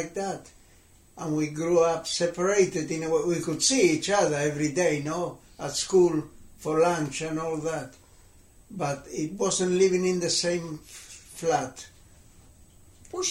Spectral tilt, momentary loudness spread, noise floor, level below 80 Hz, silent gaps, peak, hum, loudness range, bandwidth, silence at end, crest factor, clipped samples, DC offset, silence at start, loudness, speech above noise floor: -4 dB/octave; 16 LU; -56 dBFS; -58 dBFS; none; -10 dBFS; none; 5 LU; 15 kHz; 0 s; 18 dB; under 0.1%; under 0.1%; 0 s; -26 LUFS; 30 dB